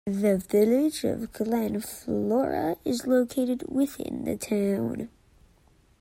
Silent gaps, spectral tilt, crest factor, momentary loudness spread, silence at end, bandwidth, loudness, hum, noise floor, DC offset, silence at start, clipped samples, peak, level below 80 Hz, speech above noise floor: none; -6 dB/octave; 16 dB; 9 LU; 0.95 s; 16 kHz; -27 LUFS; none; -61 dBFS; under 0.1%; 0.05 s; under 0.1%; -10 dBFS; -58 dBFS; 35 dB